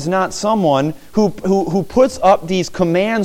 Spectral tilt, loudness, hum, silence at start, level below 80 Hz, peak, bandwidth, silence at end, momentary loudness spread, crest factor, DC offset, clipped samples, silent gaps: -6 dB/octave; -16 LUFS; none; 0 s; -44 dBFS; -2 dBFS; 16.5 kHz; 0 s; 5 LU; 14 dB; under 0.1%; under 0.1%; none